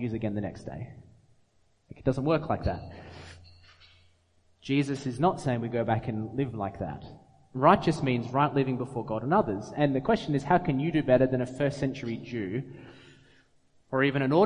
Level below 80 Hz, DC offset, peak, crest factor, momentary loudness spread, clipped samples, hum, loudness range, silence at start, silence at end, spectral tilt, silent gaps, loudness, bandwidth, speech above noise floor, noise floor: -52 dBFS; under 0.1%; -6 dBFS; 24 dB; 18 LU; under 0.1%; none; 7 LU; 0 s; 0 s; -7.5 dB/octave; none; -28 LUFS; 10.5 kHz; 38 dB; -66 dBFS